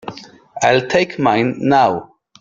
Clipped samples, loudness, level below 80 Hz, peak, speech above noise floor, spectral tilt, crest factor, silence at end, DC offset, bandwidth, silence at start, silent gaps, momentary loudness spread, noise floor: under 0.1%; -15 LUFS; -54 dBFS; -2 dBFS; 20 dB; -5 dB/octave; 16 dB; 0.4 s; under 0.1%; 7.6 kHz; 0.05 s; none; 14 LU; -35 dBFS